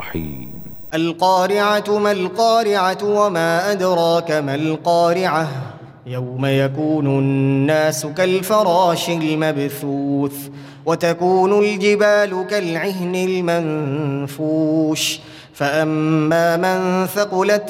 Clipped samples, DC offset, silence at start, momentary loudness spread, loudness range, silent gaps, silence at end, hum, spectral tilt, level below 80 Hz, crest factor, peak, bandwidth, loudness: under 0.1%; under 0.1%; 0 s; 10 LU; 2 LU; none; 0 s; none; -5.5 dB/octave; -56 dBFS; 14 dB; -4 dBFS; over 20 kHz; -18 LUFS